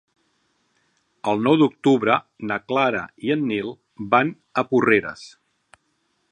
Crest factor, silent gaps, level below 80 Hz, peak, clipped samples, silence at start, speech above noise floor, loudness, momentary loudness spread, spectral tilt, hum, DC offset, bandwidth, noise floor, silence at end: 20 dB; none; -64 dBFS; -2 dBFS; under 0.1%; 1.25 s; 49 dB; -21 LUFS; 12 LU; -6.5 dB/octave; none; under 0.1%; 9.8 kHz; -70 dBFS; 1.05 s